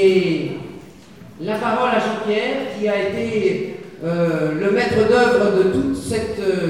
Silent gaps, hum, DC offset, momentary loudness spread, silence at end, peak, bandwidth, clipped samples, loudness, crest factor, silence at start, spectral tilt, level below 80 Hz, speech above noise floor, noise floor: none; none; 0.3%; 13 LU; 0 s; -4 dBFS; 13 kHz; under 0.1%; -19 LUFS; 16 dB; 0 s; -6 dB/octave; -48 dBFS; 23 dB; -41 dBFS